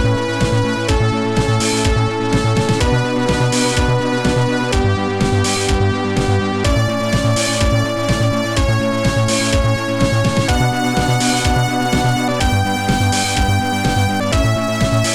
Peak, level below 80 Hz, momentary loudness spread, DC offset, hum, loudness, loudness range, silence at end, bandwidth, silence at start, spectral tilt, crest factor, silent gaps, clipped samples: -4 dBFS; -26 dBFS; 2 LU; 1%; none; -16 LUFS; 1 LU; 0 s; 16.5 kHz; 0 s; -5 dB/octave; 12 dB; none; under 0.1%